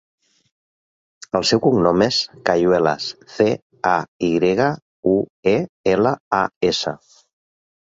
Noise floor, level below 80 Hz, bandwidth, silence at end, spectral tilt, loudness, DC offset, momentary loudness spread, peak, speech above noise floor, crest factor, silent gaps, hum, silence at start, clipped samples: under -90 dBFS; -52 dBFS; 8 kHz; 0.85 s; -5 dB/octave; -19 LUFS; under 0.1%; 7 LU; -2 dBFS; over 72 dB; 18 dB; 3.62-3.70 s, 4.08-4.19 s, 4.82-5.03 s, 5.30-5.43 s, 5.69-5.84 s, 6.20-6.31 s, 6.56-6.61 s; none; 1.35 s; under 0.1%